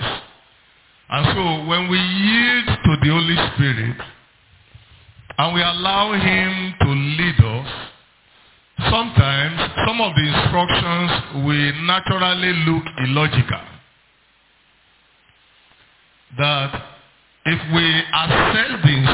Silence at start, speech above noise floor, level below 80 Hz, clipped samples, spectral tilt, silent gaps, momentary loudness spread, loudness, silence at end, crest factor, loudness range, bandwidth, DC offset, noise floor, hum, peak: 0 s; 39 dB; -38 dBFS; under 0.1%; -9.5 dB/octave; none; 10 LU; -17 LUFS; 0 s; 20 dB; 8 LU; 4 kHz; under 0.1%; -57 dBFS; none; 0 dBFS